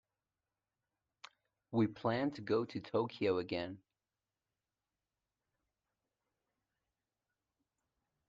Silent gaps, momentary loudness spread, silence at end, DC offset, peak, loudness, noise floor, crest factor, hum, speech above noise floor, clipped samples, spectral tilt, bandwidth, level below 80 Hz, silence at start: none; 7 LU; 4.5 s; under 0.1%; -22 dBFS; -37 LUFS; under -90 dBFS; 20 dB; none; over 54 dB; under 0.1%; -7.5 dB/octave; 7.6 kHz; -80 dBFS; 1.7 s